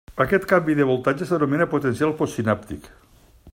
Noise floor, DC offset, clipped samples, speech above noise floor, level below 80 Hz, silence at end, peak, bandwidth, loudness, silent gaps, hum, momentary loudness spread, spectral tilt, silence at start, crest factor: -50 dBFS; under 0.1%; under 0.1%; 29 dB; -50 dBFS; 0 s; -4 dBFS; 16 kHz; -21 LUFS; none; none; 7 LU; -7 dB/octave; 0.1 s; 18 dB